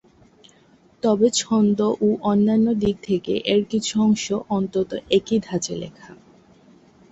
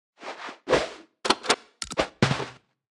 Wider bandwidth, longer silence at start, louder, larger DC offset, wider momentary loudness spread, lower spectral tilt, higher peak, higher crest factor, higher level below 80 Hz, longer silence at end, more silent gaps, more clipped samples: second, 8.2 kHz vs 12 kHz; first, 1.05 s vs 0.2 s; first, -21 LUFS vs -26 LUFS; neither; second, 7 LU vs 14 LU; about the same, -5 dB/octave vs -4 dB/octave; second, -6 dBFS vs -2 dBFS; second, 16 dB vs 26 dB; about the same, -54 dBFS vs -54 dBFS; first, 1 s vs 0.4 s; neither; neither